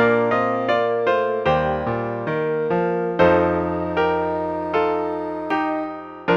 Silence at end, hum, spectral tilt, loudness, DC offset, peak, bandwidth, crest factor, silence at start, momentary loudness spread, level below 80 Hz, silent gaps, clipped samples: 0 s; none; -8 dB/octave; -21 LUFS; under 0.1%; -4 dBFS; 6.8 kHz; 16 dB; 0 s; 7 LU; -50 dBFS; none; under 0.1%